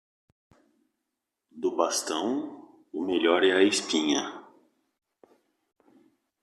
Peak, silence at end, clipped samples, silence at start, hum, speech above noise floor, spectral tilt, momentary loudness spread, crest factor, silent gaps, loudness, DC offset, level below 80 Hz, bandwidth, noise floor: -8 dBFS; 2 s; under 0.1%; 1.55 s; none; 59 dB; -2.5 dB/octave; 17 LU; 22 dB; none; -26 LUFS; under 0.1%; -78 dBFS; 13.5 kHz; -84 dBFS